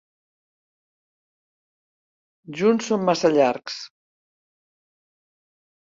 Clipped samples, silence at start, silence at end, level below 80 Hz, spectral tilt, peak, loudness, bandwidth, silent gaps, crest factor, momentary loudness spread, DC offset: under 0.1%; 2.5 s; 2 s; -70 dBFS; -5 dB/octave; -6 dBFS; -21 LUFS; 7.8 kHz; none; 22 dB; 17 LU; under 0.1%